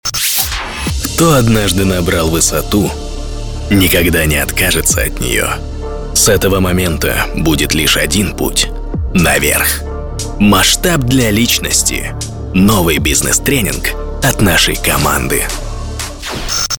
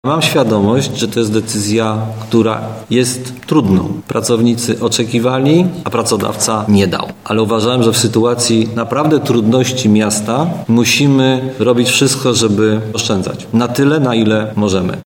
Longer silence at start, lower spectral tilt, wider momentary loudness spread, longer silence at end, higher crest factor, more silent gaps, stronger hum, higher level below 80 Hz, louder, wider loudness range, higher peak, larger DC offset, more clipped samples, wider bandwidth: about the same, 0.05 s vs 0.05 s; second, -3.5 dB/octave vs -5 dB/octave; first, 12 LU vs 5 LU; about the same, 0 s vs 0.05 s; about the same, 12 dB vs 12 dB; neither; neither; first, -22 dBFS vs -50 dBFS; about the same, -12 LUFS vs -13 LUFS; about the same, 2 LU vs 3 LU; about the same, 0 dBFS vs 0 dBFS; first, 0.4% vs 0.1%; neither; about the same, 19.5 kHz vs 18.5 kHz